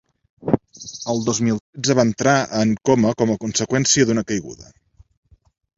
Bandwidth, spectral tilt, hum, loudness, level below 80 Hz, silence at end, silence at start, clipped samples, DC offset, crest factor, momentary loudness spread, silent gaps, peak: 7.8 kHz; -4.5 dB/octave; none; -19 LUFS; -52 dBFS; 1.15 s; 0.45 s; under 0.1%; under 0.1%; 20 dB; 10 LU; 1.61-1.73 s; 0 dBFS